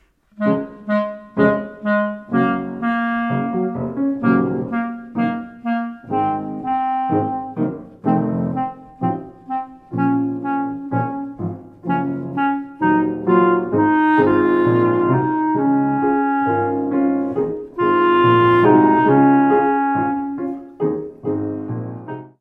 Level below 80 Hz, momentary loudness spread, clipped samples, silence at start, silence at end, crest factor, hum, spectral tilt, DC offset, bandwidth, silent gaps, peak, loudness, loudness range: -56 dBFS; 12 LU; under 0.1%; 0.4 s; 0.1 s; 18 dB; none; -10 dB/octave; under 0.1%; 4.4 kHz; none; 0 dBFS; -19 LUFS; 8 LU